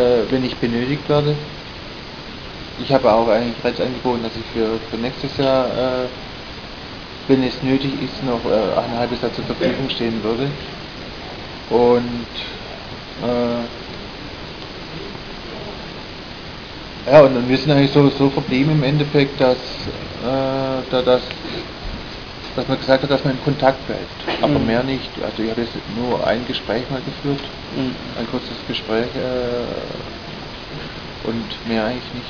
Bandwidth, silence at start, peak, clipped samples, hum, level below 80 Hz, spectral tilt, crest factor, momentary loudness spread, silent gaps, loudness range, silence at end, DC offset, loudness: 5.4 kHz; 0 s; 0 dBFS; under 0.1%; none; -40 dBFS; -7 dB/octave; 20 dB; 16 LU; none; 9 LU; 0 s; 0.2%; -20 LUFS